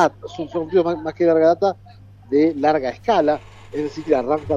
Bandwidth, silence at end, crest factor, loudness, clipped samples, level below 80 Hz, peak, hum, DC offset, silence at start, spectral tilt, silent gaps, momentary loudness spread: 7.6 kHz; 0 s; 16 dB; -19 LUFS; under 0.1%; -52 dBFS; -2 dBFS; none; under 0.1%; 0 s; -6.5 dB/octave; none; 12 LU